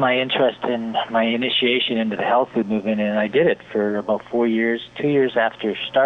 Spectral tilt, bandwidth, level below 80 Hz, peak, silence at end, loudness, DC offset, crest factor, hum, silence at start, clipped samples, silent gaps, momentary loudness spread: -7 dB/octave; 6.4 kHz; -62 dBFS; -6 dBFS; 0 s; -20 LUFS; under 0.1%; 14 dB; none; 0 s; under 0.1%; none; 5 LU